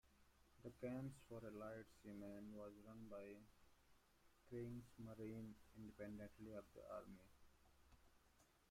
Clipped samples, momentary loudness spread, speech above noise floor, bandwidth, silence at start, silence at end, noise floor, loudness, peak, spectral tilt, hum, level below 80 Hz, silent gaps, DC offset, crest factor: under 0.1%; 8 LU; 21 dB; 16 kHz; 0.05 s; 0 s; -77 dBFS; -57 LUFS; -40 dBFS; -7.5 dB/octave; none; -76 dBFS; none; under 0.1%; 18 dB